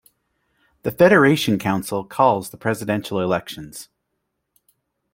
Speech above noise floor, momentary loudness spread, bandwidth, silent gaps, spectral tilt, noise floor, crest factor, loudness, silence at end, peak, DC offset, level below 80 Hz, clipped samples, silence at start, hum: 57 dB; 19 LU; 16.5 kHz; none; -5.5 dB/octave; -76 dBFS; 20 dB; -19 LUFS; 1.3 s; -2 dBFS; under 0.1%; -58 dBFS; under 0.1%; 0.85 s; none